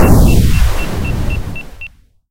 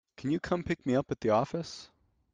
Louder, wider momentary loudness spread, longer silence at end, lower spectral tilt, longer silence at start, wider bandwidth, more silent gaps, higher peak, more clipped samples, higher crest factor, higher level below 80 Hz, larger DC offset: first, -14 LUFS vs -31 LUFS; first, 21 LU vs 11 LU; second, 0 s vs 0.5 s; about the same, -6.5 dB/octave vs -6.5 dB/octave; second, 0 s vs 0.2 s; first, 16.5 kHz vs 9.4 kHz; neither; first, 0 dBFS vs -14 dBFS; first, 0.5% vs under 0.1%; second, 12 dB vs 18 dB; first, -16 dBFS vs -60 dBFS; neither